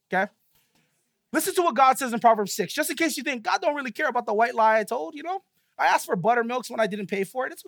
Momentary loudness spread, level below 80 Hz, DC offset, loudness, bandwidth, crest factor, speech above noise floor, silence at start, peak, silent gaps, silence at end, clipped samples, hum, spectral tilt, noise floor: 10 LU; -78 dBFS; under 0.1%; -24 LUFS; 19.5 kHz; 18 dB; 48 dB; 0.1 s; -6 dBFS; none; 0.05 s; under 0.1%; none; -3.5 dB/octave; -72 dBFS